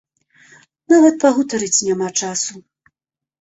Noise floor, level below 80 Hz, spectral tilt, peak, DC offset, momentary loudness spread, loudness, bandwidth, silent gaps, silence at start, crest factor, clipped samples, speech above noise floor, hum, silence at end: -81 dBFS; -62 dBFS; -3 dB/octave; -2 dBFS; under 0.1%; 10 LU; -16 LUFS; 8.2 kHz; none; 0.9 s; 16 dB; under 0.1%; 66 dB; none; 0.8 s